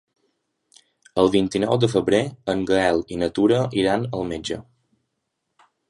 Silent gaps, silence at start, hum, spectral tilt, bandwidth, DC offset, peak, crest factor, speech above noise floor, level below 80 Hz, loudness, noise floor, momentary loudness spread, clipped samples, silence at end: none; 1.15 s; none; -6 dB/octave; 11.5 kHz; under 0.1%; -4 dBFS; 20 dB; 57 dB; -50 dBFS; -21 LUFS; -77 dBFS; 9 LU; under 0.1%; 1.3 s